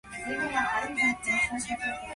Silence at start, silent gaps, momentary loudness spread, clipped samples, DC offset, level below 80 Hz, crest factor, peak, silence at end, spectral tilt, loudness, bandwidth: 0.05 s; none; 6 LU; under 0.1%; under 0.1%; -56 dBFS; 16 dB; -14 dBFS; 0 s; -2.5 dB/octave; -28 LUFS; 11.5 kHz